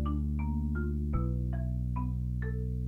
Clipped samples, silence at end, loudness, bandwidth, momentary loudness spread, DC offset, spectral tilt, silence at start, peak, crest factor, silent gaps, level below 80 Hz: under 0.1%; 0 s; -34 LUFS; 3.1 kHz; 2 LU; under 0.1%; -10.5 dB/octave; 0 s; -18 dBFS; 14 dB; none; -34 dBFS